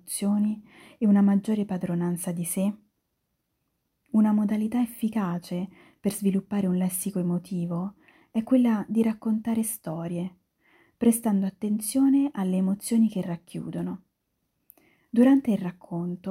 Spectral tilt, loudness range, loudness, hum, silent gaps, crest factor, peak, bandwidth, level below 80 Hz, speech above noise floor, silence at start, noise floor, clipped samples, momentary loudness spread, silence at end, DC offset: -6.5 dB/octave; 3 LU; -26 LUFS; none; none; 16 dB; -10 dBFS; 16 kHz; -66 dBFS; 53 dB; 0.05 s; -78 dBFS; under 0.1%; 12 LU; 0 s; under 0.1%